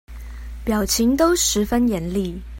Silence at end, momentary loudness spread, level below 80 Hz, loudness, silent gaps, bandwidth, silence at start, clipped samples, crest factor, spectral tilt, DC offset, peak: 0 s; 19 LU; -34 dBFS; -19 LUFS; none; 16.5 kHz; 0.1 s; under 0.1%; 14 dB; -4 dB/octave; under 0.1%; -6 dBFS